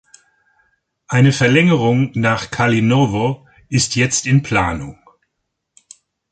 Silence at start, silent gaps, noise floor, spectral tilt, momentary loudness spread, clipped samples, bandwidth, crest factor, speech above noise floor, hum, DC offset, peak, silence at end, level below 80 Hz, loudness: 1.1 s; none; -75 dBFS; -5 dB/octave; 9 LU; under 0.1%; 9.4 kHz; 16 dB; 60 dB; none; under 0.1%; -2 dBFS; 1.4 s; -44 dBFS; -15 LUFS